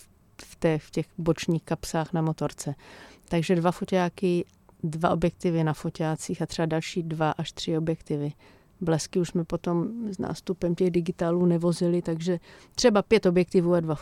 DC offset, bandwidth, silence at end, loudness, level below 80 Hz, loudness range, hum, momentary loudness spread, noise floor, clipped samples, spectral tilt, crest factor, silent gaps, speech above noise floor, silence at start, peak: under 0.1%; 13.5 kHz; 0 s; -27 LUFS; -54 dBFS; 5 LU; none; 9 LU; -51 dBFS; under 0.1%; -6.5 dB/octave; 20 dB; none; 25 dB; 0.4 s; -6 dBFS